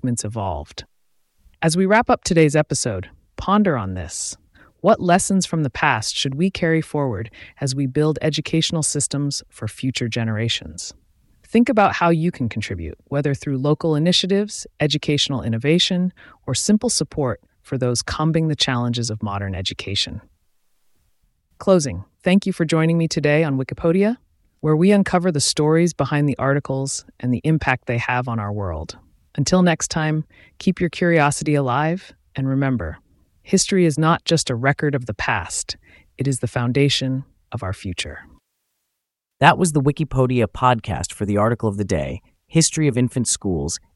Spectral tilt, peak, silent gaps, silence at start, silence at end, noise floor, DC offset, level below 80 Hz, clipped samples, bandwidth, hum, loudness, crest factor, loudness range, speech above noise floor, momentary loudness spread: -5 dB/octave; 0 dBFS; none; 0.05 s; 0.2 s; -80 dBFS; under 0.1%; -44 dBFS; under 0.1%; 12 kHz; none; -20 LUFS; 20 dB; 4 LU; 61 dB; 11 LU